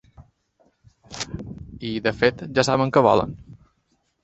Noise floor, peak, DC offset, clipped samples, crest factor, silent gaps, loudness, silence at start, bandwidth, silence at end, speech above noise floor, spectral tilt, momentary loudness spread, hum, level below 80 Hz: -69 dBFS; -2 dBFS; under 0.1%; under 0.1%; 22 dB; none; -22 LUFS; 0.2 s; 8.4 kHz; 0.7 s; 49 dB; -5 dB/octave; 19 LU; none; -50 dBFS